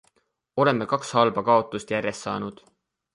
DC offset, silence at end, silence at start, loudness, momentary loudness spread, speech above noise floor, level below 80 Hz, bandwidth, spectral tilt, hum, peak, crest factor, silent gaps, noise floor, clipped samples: under 0.1%; 0.6 s; 0.55 s; -24 LUFS; 10 LU; 45 dB; -62 dBFS; 11.5 kHz; -5.5 dB/octave; none; -4 dBFS; 20 dB; none; -69 dBFS; under 0.1%